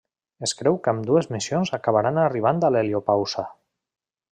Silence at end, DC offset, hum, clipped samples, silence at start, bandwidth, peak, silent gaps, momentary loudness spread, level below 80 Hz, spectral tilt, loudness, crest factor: 0.8 s; under 0.1%; none; under 0.1%; 0.4 s; 10.5 kHz; -6 dBFS; none; 8 LU; -64 dBFS; -5.5 dB/octave; -22 LUFS; 18 dB